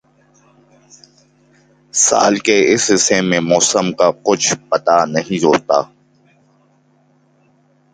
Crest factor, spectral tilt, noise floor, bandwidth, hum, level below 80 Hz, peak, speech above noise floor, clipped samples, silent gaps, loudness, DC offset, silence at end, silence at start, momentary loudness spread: 16 dB; -3 dB/octave; -55 dBFS; 10 kHz; none; -58 dBFS; 0 dBFS; 41 dB; under 0.1%; none; -14 LUFS; under 0.1%; 2.1 s; 1.95 s; 5 LU